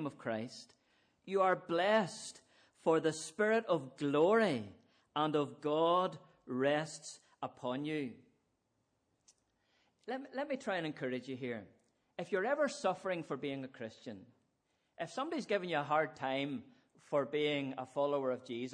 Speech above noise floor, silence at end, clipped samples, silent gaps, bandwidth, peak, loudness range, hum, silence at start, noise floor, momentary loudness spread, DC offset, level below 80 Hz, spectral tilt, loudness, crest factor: 45 dB; 0 s; under 0.1%; none; 10.5 kHz; -18 dBFS; 10 LU; none; 0 s; -81 dBFS; 15 LU; under 0.1%; -86 dBFS; -5 dB/octave; -36 LUFS; 18 dB